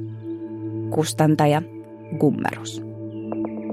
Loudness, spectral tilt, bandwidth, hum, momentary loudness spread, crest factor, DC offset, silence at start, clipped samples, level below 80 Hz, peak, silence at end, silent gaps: -24 LUFS; -6.5 dB/octave; 16 kHz; none; 15 LU; 18 dB; under 0.1%; 0 s; under 0.1%; -62 dBFS; -6 dBFS; 0 s; none